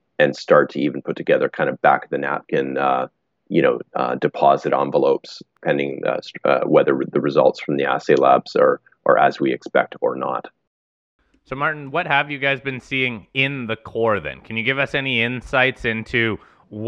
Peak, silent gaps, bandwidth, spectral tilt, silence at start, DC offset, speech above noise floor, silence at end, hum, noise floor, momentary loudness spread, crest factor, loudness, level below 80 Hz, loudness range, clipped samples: -2 dBFS; 10.67-11.19 s; 7.8 kHz; -6.5 dB/octave; 0.2 s; under 0.1%; over 71 dB; 0 s; none; under -90 dBFS; 8 LU; 18 dB; -19 LUFS; -54 dBFS; 4 LU; under 0.1%